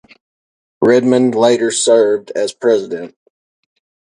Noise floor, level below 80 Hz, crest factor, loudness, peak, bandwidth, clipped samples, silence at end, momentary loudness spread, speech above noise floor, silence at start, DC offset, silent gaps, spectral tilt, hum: under -90 dBFS; -62 dBFS; 16 dB; -13 LUFS; 0 dBFS; 11.5 kHz; under 0.1%; 1.05 s; 12 LU; over 77 dB; 0.8 s; under 0.1%; none; -4 dB/octave; none